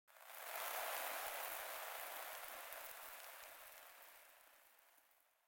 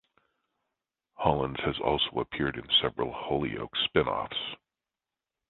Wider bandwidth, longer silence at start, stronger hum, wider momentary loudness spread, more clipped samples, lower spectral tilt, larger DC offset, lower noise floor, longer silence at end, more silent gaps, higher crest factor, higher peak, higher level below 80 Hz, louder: first, 17 kHz vs 4.3 kHz; second, 0.1 s vs 1.2 s; neither; first, 21 LU vs 9 LU; neither; second, 1.5 dB/octave vs -8.5 dB/octave; neither; second, -75 dBFS vs under -90 dBFS; second, 0.3 s vs 0.95 s; neither; about the same, 22 dB vs 24 dB; second, -28 dBFS vs -8 dBFS; second, -86 dBFS vs -52 dBFS; second, -48 LUFS vs -29 LUFS